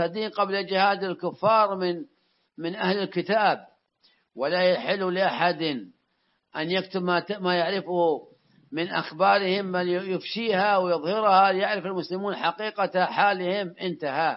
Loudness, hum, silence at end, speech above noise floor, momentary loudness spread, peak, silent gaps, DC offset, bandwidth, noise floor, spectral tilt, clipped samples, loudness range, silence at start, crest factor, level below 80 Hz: -25 LUFS; none; 0 s; 48 dB; 9 LU; -6 dBFS; none; under 0.1%; 5.8 kHz; -72 dBFS; -9 dB/octave; under 0.1%; 4 LU; 0 s; 20 dB; -80 dBFS